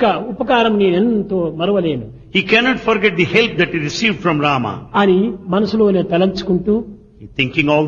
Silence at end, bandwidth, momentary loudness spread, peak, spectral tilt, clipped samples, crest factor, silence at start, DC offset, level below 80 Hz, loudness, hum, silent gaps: 0 s; 7.2 kHz; 7 LU; 0 dBFS; -6 dB/octave; under 0.1%; 16 dB; 0 s; under 0.1%; -44 dBFS; -16 LUFS; none; none